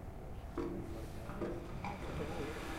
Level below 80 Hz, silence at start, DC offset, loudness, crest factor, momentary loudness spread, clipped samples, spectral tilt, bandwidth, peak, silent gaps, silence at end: -50 dBFS; 0 s; under 0.1%; -44 LUFS; 16 dB; 5 LU; under 0.1%; -6.5 dB/octave; 16 kHz; -28 dBFS; none; 0 s